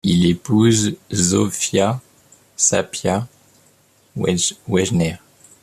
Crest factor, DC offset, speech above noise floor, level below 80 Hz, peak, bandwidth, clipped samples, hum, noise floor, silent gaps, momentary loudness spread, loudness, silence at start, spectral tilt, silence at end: 18 dB; under 0.1%; 38 dB; -52 dBFS; -2 dBFS; 14 kHz; under 0.1%; none; -55 dBFS; none; 12 LU; -18 LUFS; 0.05 s; -4.5 dB/octave; 0.45 s